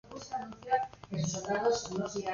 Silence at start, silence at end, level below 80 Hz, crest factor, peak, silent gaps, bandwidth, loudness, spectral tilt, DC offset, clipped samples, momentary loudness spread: 0.05 s; 0 s; -62 dBFS; 18 dB; -16 dBFS; none; 7.4 kHz; -34 LUFS; -4.5 dB/octave; under 0.1%; under 0.1%; 10 LU